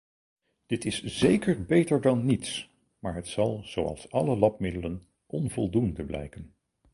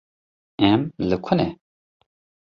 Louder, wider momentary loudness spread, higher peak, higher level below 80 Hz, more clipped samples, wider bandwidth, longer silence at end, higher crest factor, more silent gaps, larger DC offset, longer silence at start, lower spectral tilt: second, -28 LUFS vs -22 LUFS; first, 14 LU vs 8 LU; second, -8 dBFS vs -4 dBFS; about the same, -50 dBFS vs -50 dBFS; neither; first, 11.5 kHz vs 6.4 kHz; second, 0.45 s vs 1 s; about the same, 20 dB vs 20 dB; neither; neither; about the same, 0.7 s vs 0.6 s; second, -6 dB/octave vs -8.5 dB/octave